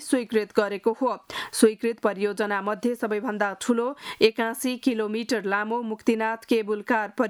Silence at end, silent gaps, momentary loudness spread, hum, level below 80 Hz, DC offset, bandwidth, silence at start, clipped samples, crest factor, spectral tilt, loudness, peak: 0 s; none; 6 LU; none; -70 dBFS; under 0.1%; 18 kHz; 0 s; under 0.1%; 20 dB; -4 dB/octave; -25 LUFS; -4 dBFS